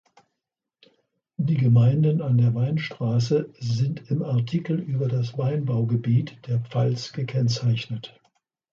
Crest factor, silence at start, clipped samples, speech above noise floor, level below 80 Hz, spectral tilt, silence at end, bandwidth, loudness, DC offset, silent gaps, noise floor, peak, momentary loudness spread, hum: 14 dB; 1.4 s; under 0.1%; 62 dB; -60 dBFS; -7.5 dB/octave; 0.65 s; 7.2 kHz; -24 LUFS; under 0.1%; none; -84 dBFS; -10 dBFS; 9 LU; none